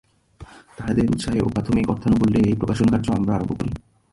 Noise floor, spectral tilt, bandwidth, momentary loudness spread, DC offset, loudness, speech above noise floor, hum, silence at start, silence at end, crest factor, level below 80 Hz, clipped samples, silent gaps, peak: -45 dBFS; -7.5 dB/octave; 11.5 kHz; 9 LU; under 0.1%; -21 LUFS; 25 dB; none; 0.4 s; 0.35 s; 14 dB; -40 dBFS; under 0.1%; none; -6 dBFS